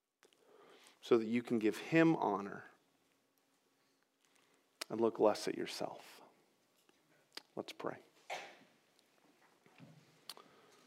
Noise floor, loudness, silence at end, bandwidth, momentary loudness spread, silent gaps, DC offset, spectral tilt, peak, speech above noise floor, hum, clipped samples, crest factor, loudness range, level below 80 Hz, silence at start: -78 dBFS; -37 LUFS; 0.55 s; 15.5 kHz; 22 LU; none; under 0.1%; -5.5 dB/octave; -16 dBFS; 42 dB; none; under 0.1%; 24 dB; 14 LU; under -90 dBFS; 1.05 s